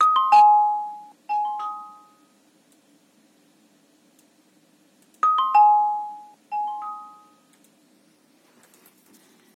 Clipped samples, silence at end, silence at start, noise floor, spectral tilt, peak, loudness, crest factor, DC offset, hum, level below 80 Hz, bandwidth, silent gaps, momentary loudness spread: under 0.1%; 2.5 s; 0 s; -60 dBFS; -1 dB/octave; -6 dBFS; -20 LUFS; 18 dB; under 0.1%; none; under -90 dBFS; 10.5 kHz; none; 23 LU